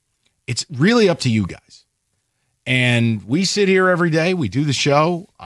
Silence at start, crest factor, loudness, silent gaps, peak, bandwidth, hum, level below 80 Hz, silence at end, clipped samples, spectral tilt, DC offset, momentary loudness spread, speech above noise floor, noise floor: 0.5 s; 16 dB; -17 LUFS; none; -2 dBFS; 12 kHz; none; -56 dBFS; 0 s; under 0.1%; -5 dB/octave; under 0.1%; 10 LU; 53 dB; -70 dBFS